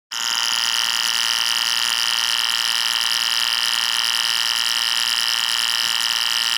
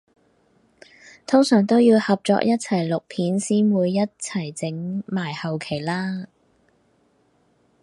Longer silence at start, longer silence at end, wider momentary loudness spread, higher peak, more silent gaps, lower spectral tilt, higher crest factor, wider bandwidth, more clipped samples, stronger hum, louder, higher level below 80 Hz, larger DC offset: second, 0.1 s vs 1.3 s; second, 0 s vs 1.55 s; second, 0 LU vs 12 LU; about the same, -6 dBFS vs -4 dBFS; neither; second, 3.5 dB/octave vs -6 dB/octave; about the same, 14 dB vs 18 dB; first, over 20 kHz vs 11.5 kHz; neither; neither; first, -17 LUFS vs -21 LUFS; second, -76 dBFS vs -66 dBFS; neither